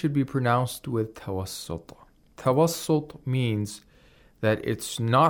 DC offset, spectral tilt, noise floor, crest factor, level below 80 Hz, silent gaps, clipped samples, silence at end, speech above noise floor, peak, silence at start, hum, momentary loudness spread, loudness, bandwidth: under 0.1%; -6 dB/octave; -56 dBFS; 18 dB; -58 dBFS; none; under 0.1%; 0 s; 31 dB; -8 dBFS; 0 s; none; 12 LU; -27 LUFS; 19 kHz